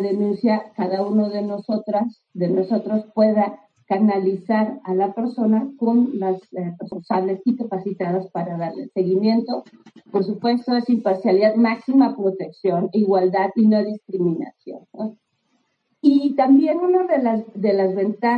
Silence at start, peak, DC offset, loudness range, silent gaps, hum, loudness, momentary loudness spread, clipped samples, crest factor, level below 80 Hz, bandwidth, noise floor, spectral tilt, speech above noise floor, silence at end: 0 s; -4 dBFS; under 0.1%; 4 LU; none; none; -20 LUFS; 10 LU; under 0.1%; 16 dB; -76 dBFS; 5 kHz; -68 dBFS; -9.5 dB/octave; 48 dB; 0 s